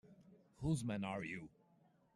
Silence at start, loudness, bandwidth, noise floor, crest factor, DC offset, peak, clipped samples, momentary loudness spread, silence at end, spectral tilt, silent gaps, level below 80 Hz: 0.05 s; -43 LUFS; 12.5 kHz; -73 dBFS; 18 dB; under 0.1%; -28 dBFS; under 0.1%; 11 LU; 0.7 s; -6.5 dB/octave; none; -66 dBFS